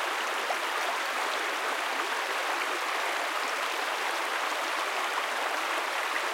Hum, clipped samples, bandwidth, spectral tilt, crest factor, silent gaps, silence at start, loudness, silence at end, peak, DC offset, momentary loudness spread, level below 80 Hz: none; under 0.1%; 16.5 kHz; 1.5 dB/octave; 14 dB; none; 0 s; -29 LUFS; 0 s; -16 dBFS; under 0.1%; 0 LU; under -90 dBFS